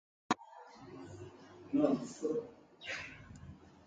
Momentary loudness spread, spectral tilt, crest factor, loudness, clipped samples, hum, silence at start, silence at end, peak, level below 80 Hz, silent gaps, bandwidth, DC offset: 21 LU; -5.5 dB/octave; 24 dB; -38 LUFS; under 0.1%; none; 0.3 s; 0.1 s; -16 dBFS; -68 dBFS; none; 9.2 kHz; under 0.1%